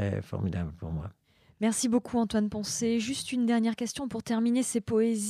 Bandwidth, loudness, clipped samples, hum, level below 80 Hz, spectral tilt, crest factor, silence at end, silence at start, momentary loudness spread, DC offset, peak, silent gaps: 14.5 kHz; -29 LUFS; under 0.1%; none; -54 dBFS; -5 dB/octave; 14 dB; 0 s; 0 s; 9 LU; under 0.1%; -16 dBFS; none